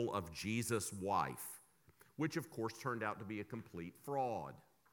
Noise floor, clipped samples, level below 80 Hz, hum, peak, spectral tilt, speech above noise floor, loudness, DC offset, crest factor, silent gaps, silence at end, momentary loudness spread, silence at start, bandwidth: -69 dBFS; under 0.1%; -72 dBFS; none; -24 dBFS; -5 dB/octave; 28 dB; -42 LUFS; under 0.1%; 20 dB; none; 0.35 s; 11 LU; 0 s; 19 kHz